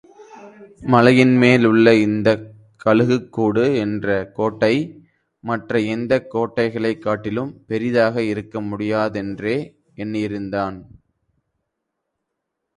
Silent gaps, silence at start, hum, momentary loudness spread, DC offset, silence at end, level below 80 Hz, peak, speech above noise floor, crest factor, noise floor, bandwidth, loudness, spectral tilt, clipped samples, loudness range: none; 0.2 s; none; 13 LU; under 0.1%; 1.95 s; -54 dBFS; 0 dBFS; 60 dB; 20 dB; -78 dBFS; 10.5 kHz; -19 LUFS; -7 dB/octave; under 0.1%; 10 LU